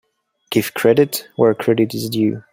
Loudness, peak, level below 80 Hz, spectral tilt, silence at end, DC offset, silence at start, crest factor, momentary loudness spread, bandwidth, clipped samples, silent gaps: -17 LUFS; -2 dBFS; -60 dBFS; -5.5 dB/octave; 0.15 s; under 0.1%; 0.5 s; 16 dB; 6 LU; 16.5 kHz; under 0.1%; none